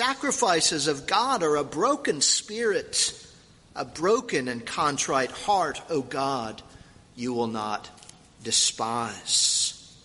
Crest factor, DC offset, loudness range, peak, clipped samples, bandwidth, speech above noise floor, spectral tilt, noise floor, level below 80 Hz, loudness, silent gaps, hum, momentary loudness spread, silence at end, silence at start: 18 dB; under 0.1%; 5 LU; -8 dBFS; under 0.1%; 11.5 kHz; 27 dB; -1.5 dB/octave; -53 dBFS; -60 dBFS; -25 LUFS; none; none; 14 LU; 0.15 s; 0 s